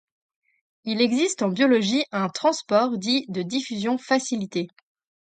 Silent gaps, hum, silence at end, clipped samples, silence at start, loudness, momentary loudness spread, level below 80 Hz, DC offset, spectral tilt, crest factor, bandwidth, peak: none; none; 0.55 s; under 0.1%; 0.85 s; -23 LUFS; 10 LU; -72 dBFS; under 0.1%; -4 dB/octave; 18 dB; 9.4 kHz; -6 dBFS